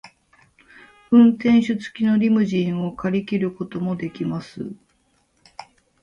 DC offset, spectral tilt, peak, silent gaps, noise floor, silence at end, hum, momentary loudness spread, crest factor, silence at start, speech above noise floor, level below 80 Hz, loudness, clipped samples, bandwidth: under 0.1%; -8 dB/octave; -4 dBFS; none; -64 dBFS; 0.4 s; none; 14 LU; 18 dB; 0.05 s; 45 dB; -58 dBFS; -20 LUFS; under 0.1%; 7.2 kHz